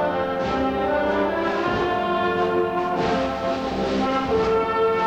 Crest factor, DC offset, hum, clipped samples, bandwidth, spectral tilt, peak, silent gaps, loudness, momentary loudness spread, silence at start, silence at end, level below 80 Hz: 12 dB; under 0.1%; none; under 0.1%; 8.8 kHz; -6 dB/octave; -10 dBFS; none; -22 LUFS; 3 LU; 0 s; 0 s; -44 dBFS